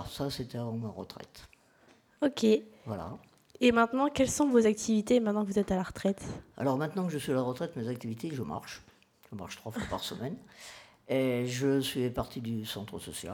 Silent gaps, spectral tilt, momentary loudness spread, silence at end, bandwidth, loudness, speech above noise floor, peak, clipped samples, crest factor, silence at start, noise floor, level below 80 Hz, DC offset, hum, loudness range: none; -5.5 dB/octave; 19 LU; 0 s; 19 kHz; -31 LUFS; 32 dB; -12 dBFS; under 0.1%; 20 dB; 0 s; -63 dBFS; -58 dBFS; under 0.1%; none; 9 LU